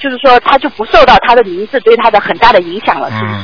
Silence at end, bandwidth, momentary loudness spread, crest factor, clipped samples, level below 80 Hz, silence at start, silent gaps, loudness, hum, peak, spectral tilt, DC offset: 0 s; 5.4 kHz; 9 LU; 8 dB; 4%; -32 dBFS; 0 s; none; -8 LUFS; none; 0 dBFS; -5.5 dB/octave; 3%